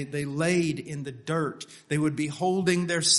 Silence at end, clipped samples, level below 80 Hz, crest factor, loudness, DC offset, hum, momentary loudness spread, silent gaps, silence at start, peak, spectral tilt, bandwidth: 0 s; under 0.1%; -64 dBFS; 18 dB; -28 LUFS; under 0.1%; none; 10 LU; none; 0 s; -8 dBFS; -4 dB/octave; 11.5 kHz